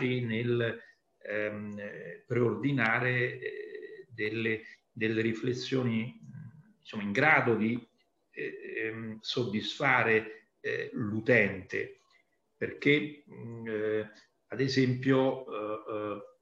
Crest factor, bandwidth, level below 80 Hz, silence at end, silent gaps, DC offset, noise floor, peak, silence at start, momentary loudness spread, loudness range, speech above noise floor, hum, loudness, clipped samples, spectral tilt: 22 dB; 7.8 kHz; -74 dBFS; 0.15 s; none; under 0.1%; -70 dBFS; -10 dBFS; 0 s; 18 LU; 4 LU; 39 dB; none; -31 LUFS; under 0.1%; -6.5 dB/octave